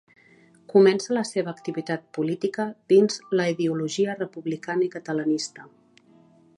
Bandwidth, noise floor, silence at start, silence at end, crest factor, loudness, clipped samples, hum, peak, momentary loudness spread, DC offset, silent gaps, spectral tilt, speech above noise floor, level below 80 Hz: 11 kHz; -56 dBFS; 0.7 s; 0.95 s; 18 dB; -24 LUFS; under 0.1%; none; -6 dBFS; 12 LU; under 0.1%; none; -5.5 dB/octave; 32 dB; -76 dBFS